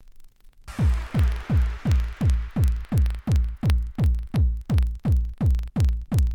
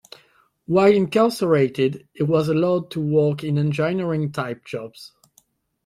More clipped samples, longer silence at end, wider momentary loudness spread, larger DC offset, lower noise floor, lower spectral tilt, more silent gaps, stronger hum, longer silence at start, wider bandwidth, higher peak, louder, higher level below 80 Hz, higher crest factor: neither; second, 0 s vs 0.8 s; second, 1 LU vs 12 LU; neither; second, -46 dBFS vs -61 dBFS; about the same, -7.5 dB/octave vs -7.5 dB/octave; neither; neither; second, 0.15 s vs 0.7 s; second, 13.5 kHz vs 15 kHz; second, -12 dBFS vs -4 dBFS; second, -24 LUFS vs -21 LUFS; first, -24 dBFS vs -60 dBFS; second, 10 dB vs 18 dB